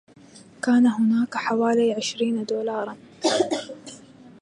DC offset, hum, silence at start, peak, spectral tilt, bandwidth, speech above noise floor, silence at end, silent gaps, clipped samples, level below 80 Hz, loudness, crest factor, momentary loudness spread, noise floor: under 0.1%; none; 0.35 s; -8 dBFS; -4.5 dB/octave; 11 kHz; 27 dB; 0.15 s; none; under 0.1%; -70 dBFS; -23 LUFS; 16 dB; 14 LU; -49 dBFS